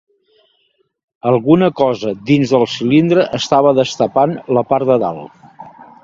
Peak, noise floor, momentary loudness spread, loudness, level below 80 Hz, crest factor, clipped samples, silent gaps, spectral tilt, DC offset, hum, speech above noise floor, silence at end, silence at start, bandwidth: 0 dBFS; -62 dBFS; 6 LU; -14 LUFS; -56 dBFS; 14 dB; under 0.1%; none; -6.5 dB/octave; under 0.1%; none; 49 dB; 0.2 s; 1.25 s; 7.8 kHz